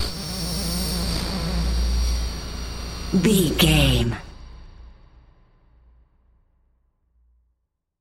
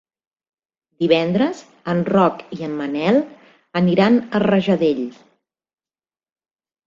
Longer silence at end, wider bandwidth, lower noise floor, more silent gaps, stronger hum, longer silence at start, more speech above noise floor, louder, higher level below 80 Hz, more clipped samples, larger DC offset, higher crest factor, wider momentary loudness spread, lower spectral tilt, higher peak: first, 3.1 s vs 1.75 s; first, 17 kHz vs 7.4 kHz; second, -75 dBFS vs under -90 dBFS; neither; neither; second, 0 s vs 1 s; second, 57 dB vs over 72 dB; second, -23 LUFS vs -18 LUFS; first, -30 dBFS vs -60 dBFS; neither; neither; about the same, 20 dB vs 18 dB; first, 15 LU vs 11 LU; second, -4.5 dB/octave vs -7.5 dB/octave; about the same, -4 dBFS vs -2 dBFS